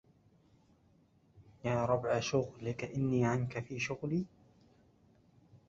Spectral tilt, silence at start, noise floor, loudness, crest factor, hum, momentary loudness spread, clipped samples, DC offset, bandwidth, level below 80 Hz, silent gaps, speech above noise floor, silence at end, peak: -6 dB/octave; 1.35 s; -68 dBFS; -35 LUFS; 20 dB; none; 8 LU; under 0.1%; under 0.1%; 7.8 kHz; -64 dBFS; none; 34 dB; 0.1 s; -18 dBFS